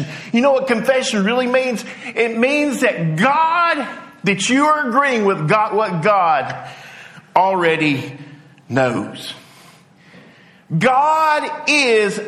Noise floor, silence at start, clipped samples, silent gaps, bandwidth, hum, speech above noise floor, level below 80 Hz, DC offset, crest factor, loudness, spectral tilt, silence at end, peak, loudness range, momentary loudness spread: -46 dBFS; 0 s; under 0.1%; none; 14.5 kHz; none; 30 dB; -64 dBFS; under 0.1%; 16 dB; -16 LUFS; -4.5 dB/octave; 0 s; -2 dBFS; 4 LU; 14 LU